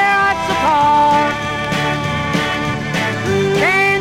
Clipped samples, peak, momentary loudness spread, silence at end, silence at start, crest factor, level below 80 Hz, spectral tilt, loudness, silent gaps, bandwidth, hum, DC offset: under 0.1%; -4 dBFS; 6 LU; 0 s; 0 s; 12 dB; -40 dBFS; -4.5 dB/octave; -15 LUFS; none; 16.5 kHz; none; under 0.1%